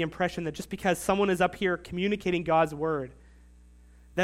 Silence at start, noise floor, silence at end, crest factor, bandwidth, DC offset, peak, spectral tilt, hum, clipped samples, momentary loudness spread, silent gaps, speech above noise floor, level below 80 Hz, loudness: 0 s; -54 dBFS; 0 s; 18 dB; 16 kHz; under 0.1%; -12 dBFS; -5.5 dB/octave; 60 Hz at -50 dBFS; under 0.1%; 10 LU; none; 26 dB; -52 dBFS; -28 LUFS